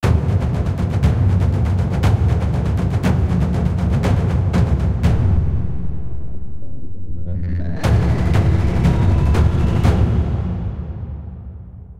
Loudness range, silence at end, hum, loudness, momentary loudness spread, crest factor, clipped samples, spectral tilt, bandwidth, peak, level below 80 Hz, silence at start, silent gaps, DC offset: 5 LU; 0 s; none; -18 LUFS; 16 LU; 12 dB; under 0.1%; -8 dB/octave; 11 kHz; -4 dBFS; -22 dBFS; 0 s; none; under 0.1%